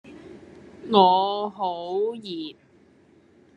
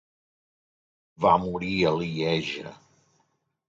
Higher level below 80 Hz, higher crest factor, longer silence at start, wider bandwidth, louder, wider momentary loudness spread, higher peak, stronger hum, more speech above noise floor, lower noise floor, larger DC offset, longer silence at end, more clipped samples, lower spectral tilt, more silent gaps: second, -68 dBFS vs -56 dBFS; about the same, 24 dB vs 22 dB; second, 0.05 s vs 1.2 s; first, 9.4 kHz vs 7.8 kHz; about the same, -23 LUFS vs -25 LUFS; first, 25 LU vs 12 LU; first, -2 dBFS vs -6 dBFS; neither; second, 34 dB vs 47 dB; second, -56 dBFS vs -72 dBFS; neither; about the same, 1.05 s vs 0.95 s; neither; about the same, -7 dB/octave vs -6 dB/octave; neither